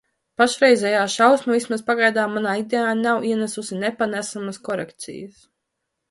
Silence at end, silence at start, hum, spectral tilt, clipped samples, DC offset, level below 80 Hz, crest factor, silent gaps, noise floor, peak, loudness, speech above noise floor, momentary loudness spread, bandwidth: 0.8 s; 0.4 s; none; -3.5 dB/octave; under 0.1%; under 0.1%; -68 dBFS; 20 dB; none; -79 dBFS; -2 dBFS; -20 LUFS; 58 dB; 14 LU; 11.5 kHz